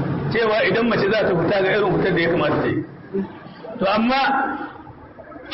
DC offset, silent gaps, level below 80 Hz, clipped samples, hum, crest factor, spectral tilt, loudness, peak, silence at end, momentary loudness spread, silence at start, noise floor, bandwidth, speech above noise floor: under 0.1%; none; -50 dBFS; under 0.1%; none; 12 dB; -10 dB/octave; -19 LUFS; -8 dBFS; 0 s; 17 LU; 0 s; -40 dBFS; 5.8 kHz; 21 dB